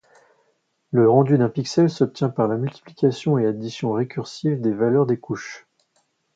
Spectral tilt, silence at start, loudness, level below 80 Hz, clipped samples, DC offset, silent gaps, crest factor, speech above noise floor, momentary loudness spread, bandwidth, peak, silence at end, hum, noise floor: -7.5 dB/octave; 0.9 s; -21 LUFS; -64 dBFS; under 0.1%; under 0.1%; none; 18 dB; 48 dB; 12 LU; 7.8 kHz; -2 dBFS; 0.8 s; none; -68 dBFS